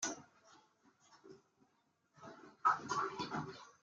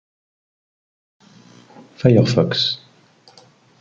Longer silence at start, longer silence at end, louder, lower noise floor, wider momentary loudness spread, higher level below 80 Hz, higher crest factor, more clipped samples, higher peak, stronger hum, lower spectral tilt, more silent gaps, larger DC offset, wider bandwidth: second, 0 s vs 2 s; second, 0.1 s vs 1.05 s; second, -39 LUFS vs -17 LUFS; first, -79 dBFS vs -52 dBFS; first, 24 LU vs 7 LU; second, -84 dBFS vs -56 dBFS; about the same, 24 dB vs 20 dB; neither; second, -20 dBFS vs -2 dBFS; neither; second, -3 dB/octave vs -6.5 dB/octave; neither; neither; first, 9.6 kHz vs 7.6 kHz